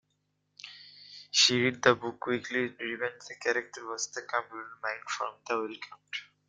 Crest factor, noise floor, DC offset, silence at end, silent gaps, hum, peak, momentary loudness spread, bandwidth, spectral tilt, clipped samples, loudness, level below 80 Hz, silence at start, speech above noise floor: 26 dB; -77 dBFS; under 0.1%; 0.25 s; none; 50 Hz at -75 dBFS; -8 dBFS; 23 LU; 9.6 kHz; -2.5 dB/octave; under 0.1%; -30 LUFS; -74 dBFS; 0.65 s; 45 dB